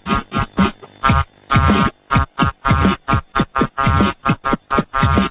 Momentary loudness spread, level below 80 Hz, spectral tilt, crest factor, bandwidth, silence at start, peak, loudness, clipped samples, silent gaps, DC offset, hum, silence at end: 4 LU; -26 dBFS; -10.5 dB/octave; 16 dB; 4 kHz; 0.05 s; 0 dBFS; -17 LUFS; under 0.1%; none; under 0.1%; none; 0 s